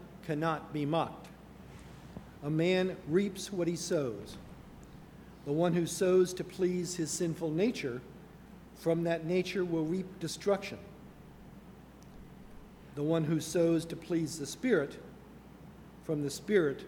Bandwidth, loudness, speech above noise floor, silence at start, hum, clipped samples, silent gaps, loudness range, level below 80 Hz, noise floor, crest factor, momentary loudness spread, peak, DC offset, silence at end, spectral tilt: 19 kHz; -33 LUFS; 21 dB; 0 s; none; under 0.1%; none; 4 LU; -60 dBFS; -53 dBFS; 20 dB; 23 LU; -14 dBFS; under 0.1%; 0 s; -5.5 dB/octave